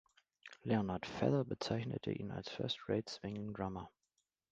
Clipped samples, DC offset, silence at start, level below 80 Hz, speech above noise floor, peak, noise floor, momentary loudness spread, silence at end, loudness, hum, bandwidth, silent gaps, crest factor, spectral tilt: under 0.1%; under 0.1%; 0.45 s; -66 dBFS; 46 dB; -20 dBFS; -86 dBFS; 13 LU; 0.65 s; -40 LUFS; none; 9 kHz; none; 22 dB; -6.5 dB/octave